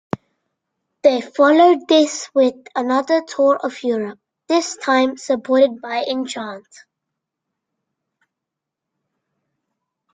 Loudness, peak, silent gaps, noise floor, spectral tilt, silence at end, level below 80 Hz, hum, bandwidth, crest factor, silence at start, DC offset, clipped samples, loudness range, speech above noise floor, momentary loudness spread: -17 LUFS; -2 dBFS; none; -83 dBFS; -3.5 dB/octave; 3.55 s; -68 dBFS; none; 9.4 kHz; 18 dB; 0.15 s; under 0.1%; under 0.1%; 12 LU; 66 dB; 14 LU